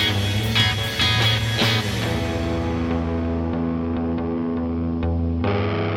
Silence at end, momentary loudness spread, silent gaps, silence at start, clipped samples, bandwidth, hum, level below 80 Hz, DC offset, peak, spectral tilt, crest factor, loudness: 0 s; 6 LU; none; 0 s; under 0.1%; 16.5 kHz; none; -34 dBFS; under 0.1%; -4 dBFS; -5 dB/octave; 16 dB; -22 LUFS